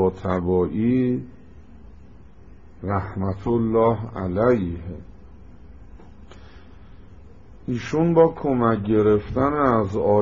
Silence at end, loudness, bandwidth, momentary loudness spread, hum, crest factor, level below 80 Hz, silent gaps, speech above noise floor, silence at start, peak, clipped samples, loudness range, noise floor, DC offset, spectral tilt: 0 s; -21 LUFS; 7.4 kHz; 11 LU; none; 20 dB; -46 dBFS; none; 26 dB; 0 s; -4 dBFS; under 0.1%; 8 LU; -47 dBFS; 0.5%; -8 dB/octave